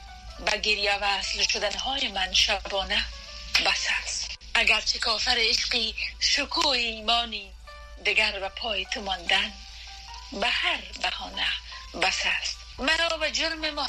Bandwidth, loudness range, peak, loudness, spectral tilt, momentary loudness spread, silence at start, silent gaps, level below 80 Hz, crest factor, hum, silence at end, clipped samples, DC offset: 14 kHz; 4 LU; -6 dBFS; -24 LUFS; -1 dB/octave; 11 LU; 0 s; none; -44 dBFS; 22 dB; none; 0 s; under 0.1%; under 0.1%